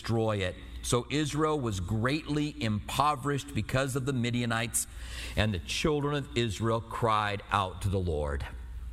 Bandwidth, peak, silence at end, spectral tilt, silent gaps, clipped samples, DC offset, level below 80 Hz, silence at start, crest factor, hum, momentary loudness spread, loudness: 15.5 kHz; -10 dBFS; 0 s; -5 dB/octave; none; under 0.1%; under 0.1%; -44 dBFS; 0 s; 20 dB; none; 6 LU; -30 LUFS